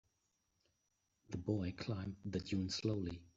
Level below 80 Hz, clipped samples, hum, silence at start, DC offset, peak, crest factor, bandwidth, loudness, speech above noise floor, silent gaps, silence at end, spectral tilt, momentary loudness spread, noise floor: -68 dBFS; under 0.1%; none; 1.3 s; under 0.1%; -24 dBFS; 18 dB; 8 kHz; -42 LUFS; 43 dB; none; 0.1 s; -6.5 dB/octave; 6 LU; -84 dBFS